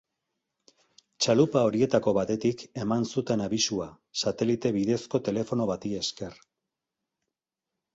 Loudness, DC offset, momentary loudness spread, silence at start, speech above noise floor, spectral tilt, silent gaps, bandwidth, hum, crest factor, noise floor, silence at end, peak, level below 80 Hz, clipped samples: -27 LUFS; under 0.1%; 9 LU; 1.2 s; 61 dB; -5 dB/octave; none; 8.2 kHz; none; 22 dB; -88 dBFS; 1.6 s; -8 dBFS; -62 dBFS; under 0.1%